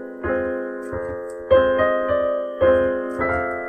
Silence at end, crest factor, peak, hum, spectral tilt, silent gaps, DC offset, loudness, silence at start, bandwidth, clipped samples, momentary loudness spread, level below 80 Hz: 0 s; 16 dB; -4 dBFS; none; -7 dB/octave; none; under 0.1%; -21 LUFS; 0 s; 9 kHz; under 0.1%; 12 LU; -44 dBFS